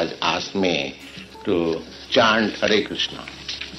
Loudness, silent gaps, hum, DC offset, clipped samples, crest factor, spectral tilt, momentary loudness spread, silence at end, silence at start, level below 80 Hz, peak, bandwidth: -22 LUFS; none; none; under 0.1%; under 0.1%; 20 dB; -4 dB/octave; 14 LU; 0 s; 0 s; -52 dBFS; -2 dBFS; 12.5 kHz